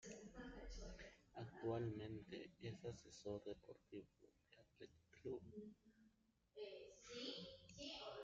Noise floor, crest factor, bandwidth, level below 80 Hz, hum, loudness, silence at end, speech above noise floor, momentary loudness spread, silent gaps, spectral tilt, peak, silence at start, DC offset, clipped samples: -80 dBFS; 20 dB; 7.6 kHz; -68 dBFS; none; -54 LUFS; 0 s; 26 dB; 12 LU; none; -5 dB/octave; -36 dBFS; 0 s; under 0.1%; under 0.1%